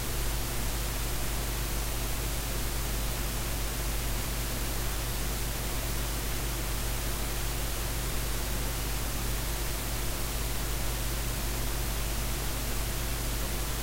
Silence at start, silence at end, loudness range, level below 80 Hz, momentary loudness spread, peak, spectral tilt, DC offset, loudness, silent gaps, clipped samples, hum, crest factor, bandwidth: 0 s; 0 s; 0 LU; -34 dBFS; 0 LU; -18 dBFS; -3.5 dB/octave; under 0.1%; -32 LUFS; none; under 0.1%; none; 12 dB; 16 kHz